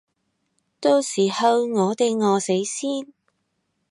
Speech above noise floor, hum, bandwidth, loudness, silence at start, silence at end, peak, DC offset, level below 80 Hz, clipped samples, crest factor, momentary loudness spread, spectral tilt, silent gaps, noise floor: 53 dB; none; 11.5 kHz; -21 LUFS; 0.8 s; 0.85 s; -6 dBFS; under 0.1%; -78 dBFS; under 0.1%; 18 dB; 7 LU; -4.5 dB/octave; none; -73 dBFS